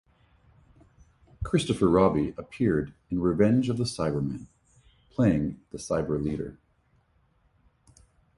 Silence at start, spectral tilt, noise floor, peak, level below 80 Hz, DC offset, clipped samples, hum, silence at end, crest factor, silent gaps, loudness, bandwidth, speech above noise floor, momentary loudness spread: 1.4 s; -7 dB/octave; -67 dBFS; -8 dBFS; -48 dBFS; under 0.1%; under 0.1%; none; 1.85 s; 20 dB; none; -27 LUFS; 11.5 kHz; 41 dB; 13 LU